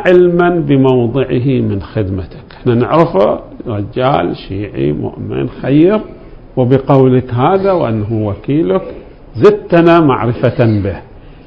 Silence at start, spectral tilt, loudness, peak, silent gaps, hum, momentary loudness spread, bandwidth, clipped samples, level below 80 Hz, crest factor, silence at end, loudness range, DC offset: 0 s; -10 dB/octave; -12 LUFS; 0 dBFS; none; none; 12 LU; 6.2 kHz; 0.6%; -36 dBFS; 12 dB; 0.05 s; 3 LU; under 0.1%